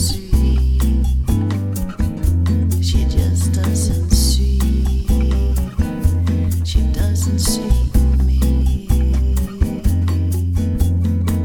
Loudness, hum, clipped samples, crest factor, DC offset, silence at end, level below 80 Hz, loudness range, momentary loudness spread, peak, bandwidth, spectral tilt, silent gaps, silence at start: -18 LUFS; none; under 0.1%; 14 dB; under 0.1%; 0 s; -18 dBFS; 1 LU; 4 LU; -2 dBFS; 19 kHz; -6 dB/octave; none; 0 s